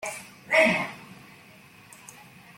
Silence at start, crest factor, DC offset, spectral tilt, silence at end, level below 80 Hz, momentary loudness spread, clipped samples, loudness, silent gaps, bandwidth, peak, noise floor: 0 s; 22 dB; under 0.1%; -3.5 dB/octave; 1.45 s; -68 dBFS; 26 LU; under 0.1%; -23 LUFS; none; 16.5 kHz; -8 dBFS; -52 dBFS